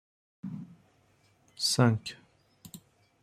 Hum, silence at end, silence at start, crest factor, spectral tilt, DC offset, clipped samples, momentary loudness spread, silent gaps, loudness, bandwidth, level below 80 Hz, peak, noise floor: none; 0.45 s; 0.45 s; 24 dB; -4.5 dB/octave; under 0.1%; under 0.1%; 27 LU; none; -29 LUFS; 15.5 kHz; -68 dBFS; -10 dBFS; -67 dBFS